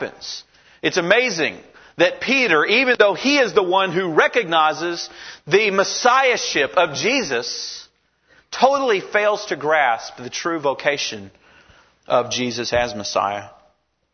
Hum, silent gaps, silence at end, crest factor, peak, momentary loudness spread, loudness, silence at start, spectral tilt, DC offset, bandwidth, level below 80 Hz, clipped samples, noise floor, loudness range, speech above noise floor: none; none; 0.65 s; 20 dB; 0 dBFS; 13 LU; -18 LUFS; 0 s; -3 dB/octave; under 0.1%; 6.6 kHz; -56 dBFS; under 0.1%; -62 dBFS; 6 LU; 43 dB